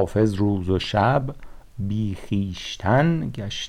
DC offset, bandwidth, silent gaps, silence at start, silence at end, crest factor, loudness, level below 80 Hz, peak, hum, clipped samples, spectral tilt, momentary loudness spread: under 0.1%; 12 kHz; none; 0 s; 0 s; 14 dB; -23 LUFS; -42 dBFS; -8 dBFS; none; under 0.1%; -6.5 dB/octave; 10 LU